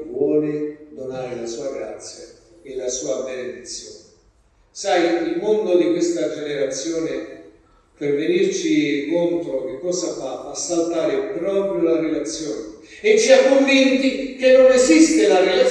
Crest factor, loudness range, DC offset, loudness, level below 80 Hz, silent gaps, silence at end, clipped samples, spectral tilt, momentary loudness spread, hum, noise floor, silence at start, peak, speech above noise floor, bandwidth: 18 dB; 13 LU; under 0.1%; -19 LUFS; -56 dBFS; none; 0 s; under 0.1%; -3.5 dB/octave; 18 LU; none; -57 dBFS; 0 s; 0 dBFS; 38 dB; 10.5 kHz